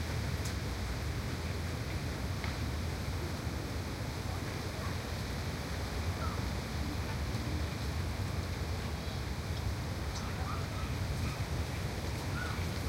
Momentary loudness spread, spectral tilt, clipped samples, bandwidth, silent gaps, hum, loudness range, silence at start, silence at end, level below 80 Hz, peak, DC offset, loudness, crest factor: 2 LU; -5 dB/octave; under 0.1%; 16 kHz; none; none; 1 LU; 0 s; 0 s; -42 dBFS; -24 dBFS; under 0.1%; -37 LUFS; 14 dB